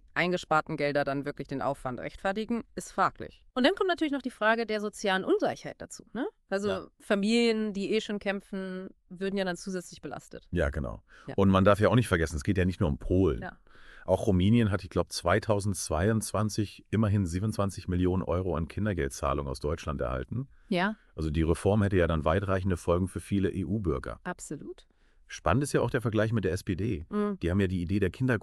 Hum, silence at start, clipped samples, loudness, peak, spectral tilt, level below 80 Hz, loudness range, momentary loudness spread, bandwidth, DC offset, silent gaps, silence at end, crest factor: none; 0.15 s; under 0.1%; -29 LUFS; -8 dBFS; -6 dB/octave; -46 dBFS; 4 LU; 12 LU; 13 kHz; under 0.1%; none; 0.05 s; 20 dB